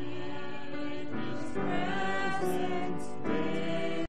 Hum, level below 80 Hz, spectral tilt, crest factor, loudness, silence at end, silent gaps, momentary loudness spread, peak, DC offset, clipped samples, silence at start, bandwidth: none; -58 dBFS; -6 dB/octave; 14 dB; -34 LUFS; 0 s; none; 8 LU; -18 dBFS; 3%; under 0.1%; 0 s; 11.5 kHz